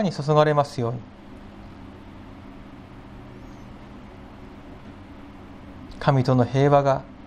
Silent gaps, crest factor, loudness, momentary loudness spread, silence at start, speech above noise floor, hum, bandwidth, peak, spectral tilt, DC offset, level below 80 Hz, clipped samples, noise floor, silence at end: none; 20 dB; -21 LUFS; 25 LU; 0 s; 22 dB; none; 9.8 kHz; -4 dBFS; -7.5 dB/octave; under 0.1%; -48 dBFS; under 0.1%; -42 dBFS; 0 s